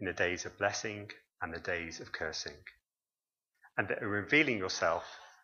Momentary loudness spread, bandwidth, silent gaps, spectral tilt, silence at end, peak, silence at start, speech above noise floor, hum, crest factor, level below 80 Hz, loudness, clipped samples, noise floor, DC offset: 17 LU; 7.4 kHz; none; -3.5 dB/octave; 0.15 s; -12 dBFS; 0 s; over 55 dB; none; 24 dB; -66 dBFS; -34 LUFS; under 0.1%; under -90 dBFS; under 0.1%